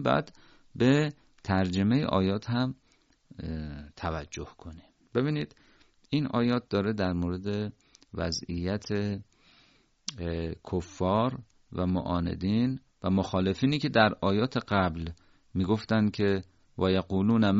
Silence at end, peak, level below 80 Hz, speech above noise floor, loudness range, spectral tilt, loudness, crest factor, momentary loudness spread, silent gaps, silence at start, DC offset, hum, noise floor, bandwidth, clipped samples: 0 s; -8 dBFS; -54 dBFS; 36 dB; 7 LU; -5.5 dB/octave; -29 LUFS; 22 dB; 15 LU; none; 0 s; under 0.1%; none; -64 dBFS; 7.6 kHz; under 0.1%